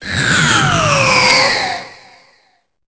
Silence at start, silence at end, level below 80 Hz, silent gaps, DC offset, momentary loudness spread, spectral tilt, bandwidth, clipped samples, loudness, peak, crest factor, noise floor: 0 s; 1 s; -38 dBFS; none; 0.1%; 9 LU; -3 dB/octave; 8 kHz; under 0.1%; -11 LUFS; 0 dBFS; 14 dB; -58 dBFS